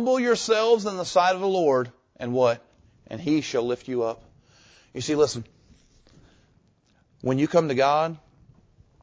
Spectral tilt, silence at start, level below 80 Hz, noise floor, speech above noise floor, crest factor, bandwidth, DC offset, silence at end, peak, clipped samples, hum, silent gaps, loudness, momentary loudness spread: -5 dB/octave; 0 s; -62 dBFS; -63 dBFS; 41 dB; 18 dB; 8 kHz; under 0.1%; 0.85 s; -6 dBFS; under 0.1%; none; none; -24 LUFS; 15 LU